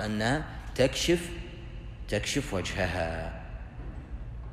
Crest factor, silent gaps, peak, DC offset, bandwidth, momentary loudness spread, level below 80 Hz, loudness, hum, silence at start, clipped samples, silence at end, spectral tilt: 20 dB; none; -12 dBFS; under 0.1%; 15.5 kHz; 16 LU; -42 dBFS; -30 LUFS; none; 0 s; under 0.1%; 0 s; -4.5 dB/octave